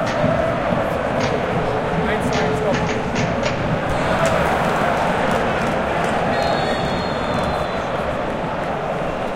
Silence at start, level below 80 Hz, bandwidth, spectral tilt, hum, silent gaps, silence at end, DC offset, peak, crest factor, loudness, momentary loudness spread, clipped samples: 0 s; -36 dBFS; 16.5 kHz; -5.5 dB/octave; none; none; 0 s; under 0.1%; -4 dBFS; 16 dB; -20 LUFS; 5 LU; under 0.1%